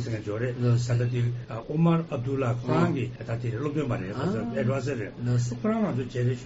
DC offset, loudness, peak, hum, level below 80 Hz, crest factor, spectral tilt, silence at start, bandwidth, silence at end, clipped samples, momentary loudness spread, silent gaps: under 0.1%; -28 LUFS; -12 dBFS; none; -52 dBFS; 16 dB; -8 dB/octave; 0 s; 8 kHz; 0 s; under 0.1%; 7 LU; none